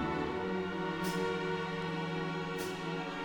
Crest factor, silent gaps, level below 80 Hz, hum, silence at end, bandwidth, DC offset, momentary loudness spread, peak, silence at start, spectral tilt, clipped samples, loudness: 12 dB; none; -60 dBFS; none; 0 s; 19 kHz; under 0.1%; 3 LU; -24 dBFS; 0 s; -5.5 dB/octave; under 0.1%; -36 LUFS